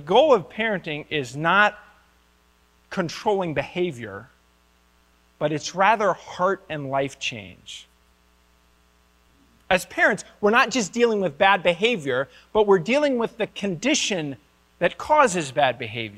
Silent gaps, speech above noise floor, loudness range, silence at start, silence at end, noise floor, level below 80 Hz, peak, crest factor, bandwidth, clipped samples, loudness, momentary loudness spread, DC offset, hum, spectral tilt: none; 38 dB; 9 LU; 0 s; 0 s; -60 dBFS; -58 dBFS; -4 dBFS; 20 dB; 14.5 kHz; under 0.1%; -22 LUFS; 11 LU; under 0.1%; none; -4 dB/octave